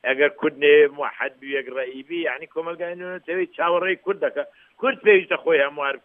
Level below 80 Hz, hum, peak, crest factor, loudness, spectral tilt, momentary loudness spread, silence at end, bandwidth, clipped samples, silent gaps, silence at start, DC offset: -80 dBFS; none; -4 dBFS; 18 dB; -22 LUFS; -7.5 dB/octave; 14 LU; 0.05 s; 3.7 kHz; under 0.1%; none; 0.05 s; under 0.1%